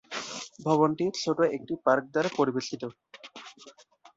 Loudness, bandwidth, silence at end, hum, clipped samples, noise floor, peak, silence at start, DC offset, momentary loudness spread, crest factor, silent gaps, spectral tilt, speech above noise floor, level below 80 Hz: -28 LUFS; 8 kHz; 0.45 s; none; under 0.1%; -48 dBFS; -10 dBFS; 0.1 s; under 0.1%; 21 LU; 20 dB; none; -5 dB/octave; 20 dB; -70 dBFS